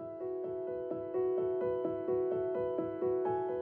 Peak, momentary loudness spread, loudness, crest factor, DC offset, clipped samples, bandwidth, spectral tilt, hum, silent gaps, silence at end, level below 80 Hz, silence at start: -24 dBFS; 6 LU; -35 LUFS; 12 dB; under 0.1%; under 0.1%; 3.3 kHz; -8 dB/octave; none; none; 0 s; -70 dBFS; 0 s